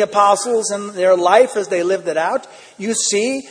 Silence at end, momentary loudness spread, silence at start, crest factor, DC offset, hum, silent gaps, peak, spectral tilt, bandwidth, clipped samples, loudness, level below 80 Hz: 0 s; 9 LU; 0 s; 16 dB; under 0.1%; none; none; 0 dBFS; -2.5 dB/octave; 10.5 kHz; under 0.1%; -16 LUFS; -68 dBFS